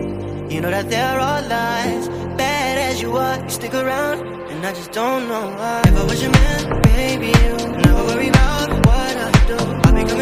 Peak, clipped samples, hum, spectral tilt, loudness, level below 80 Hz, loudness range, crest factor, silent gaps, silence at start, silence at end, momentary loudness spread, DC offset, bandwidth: 0 dBFS; under 0.1%; none; -5.5 dB/octave; -18 LUFS; -22 dBFS; 5 LU; 16 dB; none; 0 s; 0 s; 9 LU; under 0.1%; 15.5 kHz